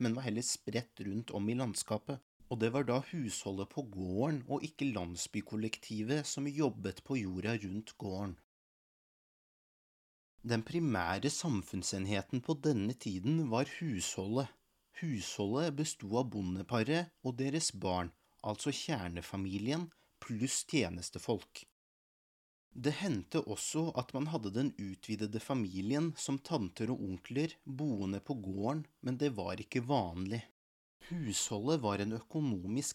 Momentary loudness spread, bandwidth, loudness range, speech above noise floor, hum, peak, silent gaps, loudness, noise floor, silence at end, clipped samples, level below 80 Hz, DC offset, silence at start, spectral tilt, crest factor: 8 LU; 16 kHz; 3 LU; over 53 dB; none; -16 dBFS; 2.22-2.40 s, 8.44-10.38 s, 21.72-22.71 s, 30.51-31.00 s; -37 LUFS; under -90 dBFS; 0 s; under 0.1%; -68 dBFS; under 0.1%; 0 s; -5 dB/octave; 20 dB